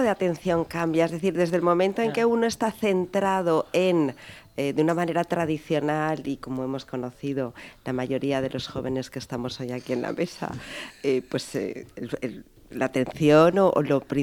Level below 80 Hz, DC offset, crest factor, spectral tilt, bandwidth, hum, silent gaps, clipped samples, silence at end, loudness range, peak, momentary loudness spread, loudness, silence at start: -56 dBFS; under 0.1%; 20 dB; -6 dB/octave; 19 kHz; none; none; under 0.1%; 0 s; 7 LU; -6 dBFS; 12 LU; -25 LUFS; 0 s